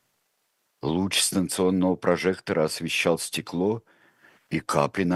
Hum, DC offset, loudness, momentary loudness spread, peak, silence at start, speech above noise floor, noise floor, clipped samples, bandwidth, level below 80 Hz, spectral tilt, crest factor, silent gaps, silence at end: none; under 0.1%; -25 LUFS; 8 LU; -4 dBFS; 0.85 s; 49 dB; -73 dBFS; under 0.1%; 13 kHz; -62 dBFS; -4 dB/octave; 22 dB; none; 0 s